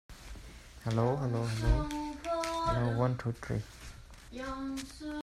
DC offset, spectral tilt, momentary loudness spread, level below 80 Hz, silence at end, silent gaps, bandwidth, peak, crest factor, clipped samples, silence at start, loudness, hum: under 0.1%; -6.5 dB/octave; 19 LU; -42 dBFS; 0 s; none; 13.5 kHz; -16 dBFS; 18 dB; under 0.1%; 0.1 s; -34 LUFS; none